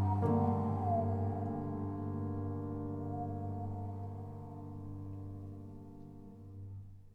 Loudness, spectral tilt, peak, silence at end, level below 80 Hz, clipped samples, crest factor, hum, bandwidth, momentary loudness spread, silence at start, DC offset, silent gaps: -38 LUFS; -11.5 dB/octave; -20 dBFS; 0 s; -58 dBFS; under 0.1%; 18 dB; none; 2.7 kHz; 19 LU; 0 s; under 0.1%; none